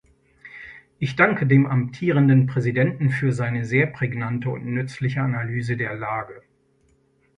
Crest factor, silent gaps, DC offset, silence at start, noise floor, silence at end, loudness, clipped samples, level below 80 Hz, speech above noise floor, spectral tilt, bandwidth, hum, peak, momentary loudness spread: 20 dB; none; under 0.1%; 0.45 s; -62 dBFS; 1 s; -22 LUFS; under 0.1%; -58 dBFS; 41 dB; -8.5 dB/octave; 9.6 kHz; none; -4 dBFS; 13 LU